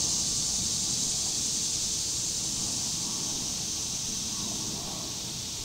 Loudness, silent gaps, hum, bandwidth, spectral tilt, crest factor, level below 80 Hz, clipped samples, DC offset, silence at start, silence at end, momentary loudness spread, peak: -28 LUFS; none; none; 16 kHz; -1 dB/octave; 14 dB; -52 dBFS; under 0.1%; under 0.1%; 0 s; 0 s; 6 LU; -16 dBFS